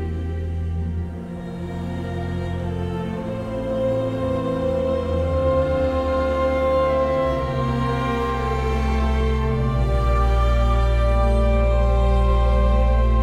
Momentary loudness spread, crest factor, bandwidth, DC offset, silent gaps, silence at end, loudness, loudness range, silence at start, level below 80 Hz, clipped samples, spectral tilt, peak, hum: 8 LU; 12 dB; 8.8 kHz; under 0.1%; none; 0 s; -22 LUFS; 7 LU; 0 s; -22 dBFS; under 0.1%; -8 dB/octave; -8 dBFS; none